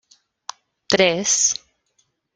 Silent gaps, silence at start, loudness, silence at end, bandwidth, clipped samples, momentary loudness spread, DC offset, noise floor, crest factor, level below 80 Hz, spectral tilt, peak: none; 0.9 s; -18 LUFS; 0.8 s; 10.5 kHz; under 0.1%; 21 LU; under 0.1%; -67 dBFS; 22 dB; -62 dBFS; -1.5 dB/octave; 0 dBFS